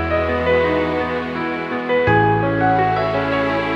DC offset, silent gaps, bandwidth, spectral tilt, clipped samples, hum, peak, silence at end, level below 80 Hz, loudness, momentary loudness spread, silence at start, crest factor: under 0.1%; none; 7.8 kHz; -8 dB/octave; under 0.1%; none; -2 dBFS; 0 s; -38 dBFS; -18 LUFS; 7 LU; 0 s; 16 dB